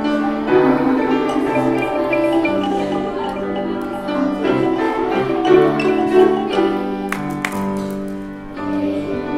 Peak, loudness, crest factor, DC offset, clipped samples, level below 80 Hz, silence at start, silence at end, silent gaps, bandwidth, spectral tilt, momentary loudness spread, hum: 0 dBFS; -18 LUFS; 16 dB; under 0.1%; under 0.1%; -44 dBFS; 0 s; 0 s; none; 15 kHz; -6.5 dB/octave; 9 LU; none